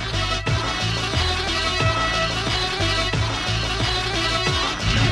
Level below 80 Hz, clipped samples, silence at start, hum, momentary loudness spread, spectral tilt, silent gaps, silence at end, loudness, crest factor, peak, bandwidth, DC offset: -32 dBFS; under 0.1%; 0 s; none; 3 LU; -3.5 dB/octave; none; 0 s; -21 LUFS; 14 dB; -8 dBFS; 12.5 kHz; under 0.1%